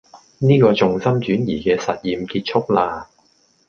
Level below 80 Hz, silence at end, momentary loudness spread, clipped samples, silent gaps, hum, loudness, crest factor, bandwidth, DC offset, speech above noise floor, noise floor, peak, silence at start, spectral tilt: -50 dBFS; 0.65 s; 10 LU; under 0.1%; none; none; -18 LUFS; 16 dB; 7 kHz; under 0.1%; 41 dB; -58 dBFS; -2 dBFS; 0.15 s; -7 dB/octave